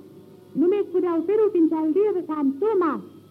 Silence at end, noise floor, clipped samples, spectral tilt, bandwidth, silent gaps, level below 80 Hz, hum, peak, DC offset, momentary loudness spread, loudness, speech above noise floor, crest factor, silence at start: 0.1 s; -47 dBFS; under 0.1%; -8.5 dB/octave; 4.6 kHz; none; -82 dBFS; none; -12 dBFS; under 0.1%; 5 LU; -22 LUFS; 25 dB; 12 dB; 0.05 s